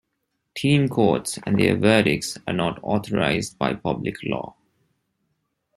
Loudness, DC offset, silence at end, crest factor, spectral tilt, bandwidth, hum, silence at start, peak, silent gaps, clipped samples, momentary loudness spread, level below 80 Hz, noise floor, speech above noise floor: -22 LUFS; under 0.1%; 1.25 s; 20 dB; -5.5 dB/octave; 14 kHz; none; 0.55 s; -4 dBFS; none; under 0.1%; 11 LU; -54 dBFS; -76 dBFS; 54 dB